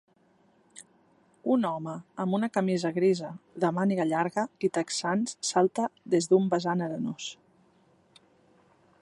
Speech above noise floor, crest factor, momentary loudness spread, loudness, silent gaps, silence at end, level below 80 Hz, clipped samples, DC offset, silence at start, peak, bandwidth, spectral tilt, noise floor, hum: 37 dB; 20 dB; 10 LU; -28 LUFS; none; 1.7 s; -76 dBFS; under 0.1%; under 0.1%; 0.75 s; -10 dBFS; 11.5 kHz; -5.5 dB/octave; -65 dBFS; none